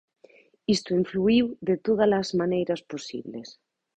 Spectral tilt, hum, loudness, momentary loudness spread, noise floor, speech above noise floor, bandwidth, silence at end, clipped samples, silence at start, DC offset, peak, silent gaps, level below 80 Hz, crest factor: -6 dB/octave; none; -25 LUFS; 14 LU; -57 dBFS; 32 dB; 9 kHz; 0.45 s; under 0.1%; 0.7 s; under 0.1%; -10 dBFS; none; -60 dBFS; 16 dB